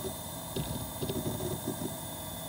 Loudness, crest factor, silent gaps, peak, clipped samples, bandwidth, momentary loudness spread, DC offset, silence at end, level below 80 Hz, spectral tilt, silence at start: -36 LUFS; 16 dB; none; -22 dBFS; under 0.1%; 17 kHz; 4 LU; under 0.1%; 0 s; -52 dBFS; -4.5 dB/octave; 0 s